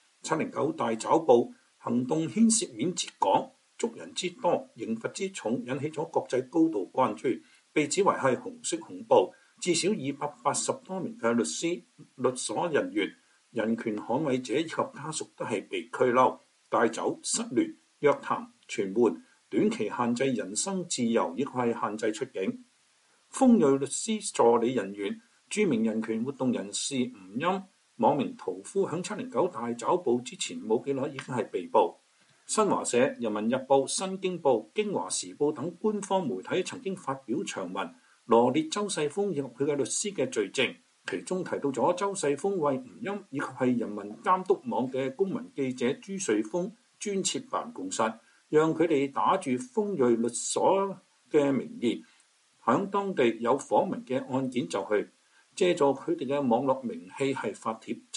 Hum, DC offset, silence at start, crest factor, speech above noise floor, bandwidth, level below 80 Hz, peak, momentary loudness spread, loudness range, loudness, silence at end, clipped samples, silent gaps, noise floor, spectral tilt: none; under 0.1%; 0.25 s; 20 dB; 38 dB; 11.5 kHz; -78 dBFS; -8 dBFS; 10 LU; 4 LU; -29 LUFS; 0 s; under 0.1%; none; -66 dBFS; -4.5 dB/octave